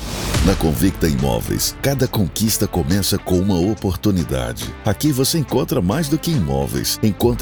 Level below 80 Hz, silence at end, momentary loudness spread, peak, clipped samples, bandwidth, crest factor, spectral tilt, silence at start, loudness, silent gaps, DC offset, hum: -30 dBFS; 0 s; 3 LU; -2 dBFS; under 0.1%; over 20 kHz; 16 dB; -5 dB/octave; 0 s; -19 LUFS; none; under 0.1%; none